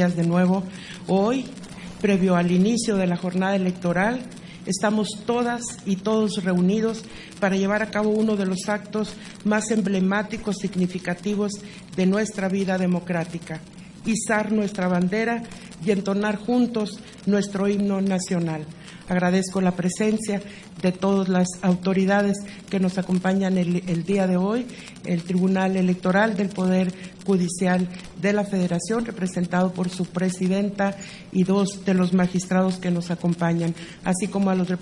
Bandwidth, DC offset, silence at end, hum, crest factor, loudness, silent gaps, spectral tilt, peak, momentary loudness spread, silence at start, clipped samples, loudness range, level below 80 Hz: 11.5 kHz; under 0.1%; 0 s; none; 16 dB; -23 LUFS; none; -6 dB/octave; -6 dBFS; 9 LU; 0 s; under 0.1%; 2 LU; -56 dBFS